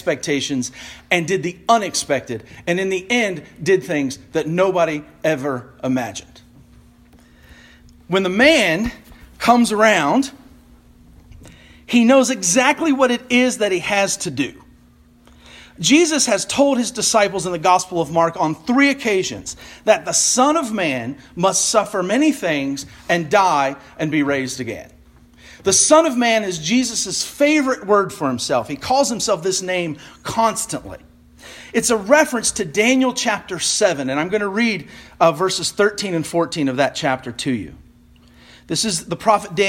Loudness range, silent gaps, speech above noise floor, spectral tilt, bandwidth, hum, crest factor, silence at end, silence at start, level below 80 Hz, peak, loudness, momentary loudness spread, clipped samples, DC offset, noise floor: 4 LU; none; 32 dB; -3 dB/octave; 16.5 kHz; none; 18 dB; 0 s; 0.05 s; -50 dBFS; 0 dBFS; -18 LUFS; 11 LU; under 0.1%; under 0.1%; -50 dBFS